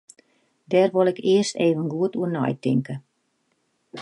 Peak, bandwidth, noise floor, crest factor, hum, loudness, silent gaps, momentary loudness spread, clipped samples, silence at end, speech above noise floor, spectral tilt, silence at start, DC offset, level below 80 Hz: -8 dBFS; 11.5 kHz; -71 dBFS; 16 dB; none; -22 LUFS; none; 10 LU; under 0.1%; 0 s; 49 dB; -6 dB/octave; 0.7 s; under 0.1%; -72 dBFS